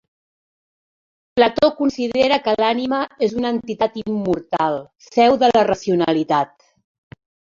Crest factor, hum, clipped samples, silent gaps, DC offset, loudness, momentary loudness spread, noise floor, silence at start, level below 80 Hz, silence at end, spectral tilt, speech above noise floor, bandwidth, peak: 18 dB; none; under 0.1%; none; under 0.1%; -18 LUFS; 8 LU; under -90 dBFS; 1.35 s; -54 dBFS; 1.1 s; -5.5 dB/octave; over 72 dB; 7.6 kHz; -2 dBFS